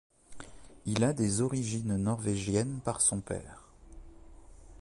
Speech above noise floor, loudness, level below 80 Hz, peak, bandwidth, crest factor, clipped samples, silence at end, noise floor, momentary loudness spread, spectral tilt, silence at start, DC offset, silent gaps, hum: 21 dB; -31 LUFS; -54 dBFS; -16 dBFS; 11.5 kHz; 18 dB; under 0.1%; 0.05 s; -51 dBFS; 23 LU; -5 dB/octave; 0.3 s; under 0.1%; none; none